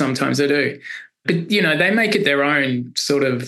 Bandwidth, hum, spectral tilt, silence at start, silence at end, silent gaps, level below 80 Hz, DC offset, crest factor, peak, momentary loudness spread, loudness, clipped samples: 13 kHz; none; -4.5 dB/octave; 0 s; 0 s; none; -68 dBFS; under 0.1%; 16 dB; -4 dBFS; 8 LU; -18 LUFS; under 0.1%